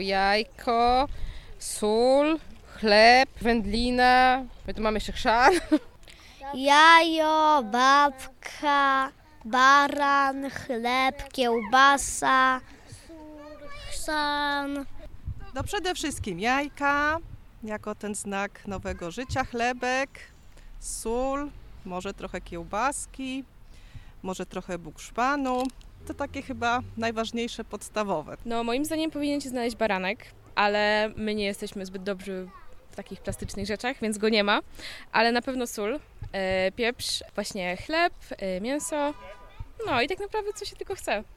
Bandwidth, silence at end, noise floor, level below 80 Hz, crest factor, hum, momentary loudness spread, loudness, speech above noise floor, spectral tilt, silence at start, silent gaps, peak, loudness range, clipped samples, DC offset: 16 kHz; 0 s; -49 dBFS; -46 dBFS; 22 dB; none; 18 LU; -25 LUFS; 23 dB; -3.5 dB/octave; 0 s; none; -4 dBFS; 11 LU; under 0.1%; under 0.1%